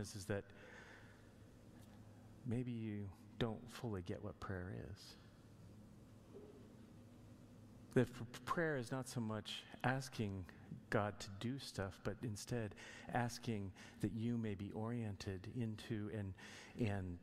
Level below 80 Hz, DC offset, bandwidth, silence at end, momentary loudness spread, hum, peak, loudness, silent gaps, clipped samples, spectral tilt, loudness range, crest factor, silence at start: -68 dBFS; under 0.1%; 15.5 kHz; 0 s; 20 LU; none; -22 dBFS; -45 LUFS; none; under 0.1%; -6 dB/octave; 8 LU; 24 dB; 0 s